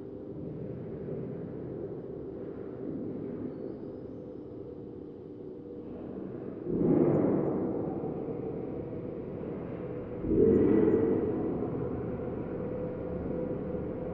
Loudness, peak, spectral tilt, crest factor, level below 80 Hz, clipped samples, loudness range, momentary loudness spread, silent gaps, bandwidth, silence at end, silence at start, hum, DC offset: -33 LUFS; -12 dBFS; -12.5 dB/octave; 20 dB; -54 dBFS; under 0.1%; 12 LU; 18 LU; none; 4 kHz; 0 s; 0 s; none; under 0.1%